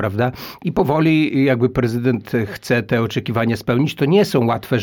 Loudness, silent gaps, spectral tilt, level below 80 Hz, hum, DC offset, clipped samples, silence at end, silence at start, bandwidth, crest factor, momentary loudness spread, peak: -18 LUFS; none; -7 dB/octave; -46 dBFS; none; under 0.1%; under 0.1%; 0 s; 0 s; 19 kHz; 14 dB; 7 LU; -4 dBFS